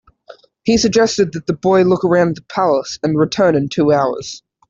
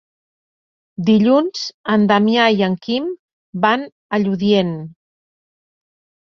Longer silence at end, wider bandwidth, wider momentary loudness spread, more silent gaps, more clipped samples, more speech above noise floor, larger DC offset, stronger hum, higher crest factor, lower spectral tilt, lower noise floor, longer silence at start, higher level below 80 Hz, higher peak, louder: second, 0.3 s vs 1.3 s; first, 7.8 kHz vs 6.8 kHz; second, 6 LU vs 17 LU; second, none vs 1.74-1.84 s, 3.19-3.53 s, 3.92-4.10 s; neither; second, 28 dB vs over 74 dB; neither; neither; about the same, 14 dB vs 16 dB; about the same, -5.5 dB/octave vs -6.5 dB/octave; second, -43 dBFS vs under -90 dBFS; second, 0.3 s vs 1 s; first, -48 dBFS vs -60 dBFS; about the same, -2 dBFS vs -2 dBFS; about the same, -15 LUFS vs -17 LUFS